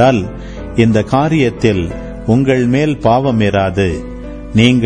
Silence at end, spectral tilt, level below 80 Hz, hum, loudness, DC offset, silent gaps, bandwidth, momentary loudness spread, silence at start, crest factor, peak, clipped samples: 0 s; -7 dB/octave; -32 dBFS; none; -13 LUFS; under 0.1%; none; 9.8 kHz; 12 LU; 0 s; 12 dB; 0 dBFS; under 0.1%